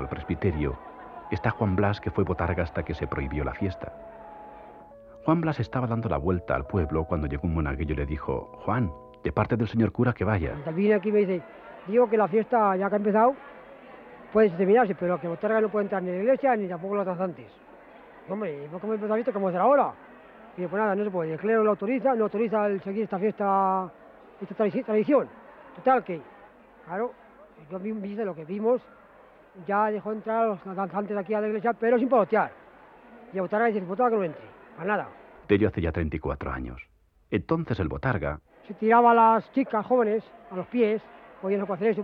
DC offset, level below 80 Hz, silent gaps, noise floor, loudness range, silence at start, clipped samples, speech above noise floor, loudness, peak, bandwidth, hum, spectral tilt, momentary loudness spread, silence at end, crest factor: under 0.1%; -46 dBFS; none; -53 dBFS; 6 LU; 0 s; under 0.1%; 28 dB; -26 LUFS; -8 dBFS; 5.4 kHz; none; -10 dB/octave; 15 LU; 0 s; 20 dB